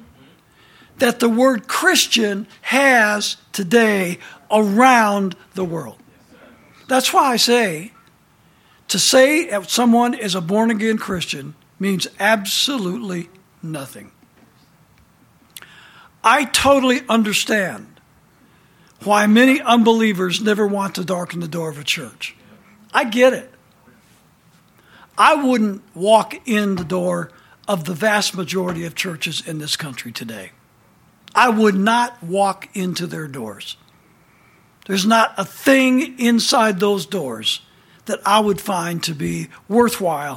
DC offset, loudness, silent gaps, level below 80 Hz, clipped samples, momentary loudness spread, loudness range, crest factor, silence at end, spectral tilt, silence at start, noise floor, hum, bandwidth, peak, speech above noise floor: under 0.1%; -17 LUFS; none; -56 dBFS; under 0.1%; 16 LU; 6 LU; 18 dB; 0 s; -3.5 dB/octave; 1 s; -54 dBFS; none; 17 kHz; 0 dBFS; 37 dB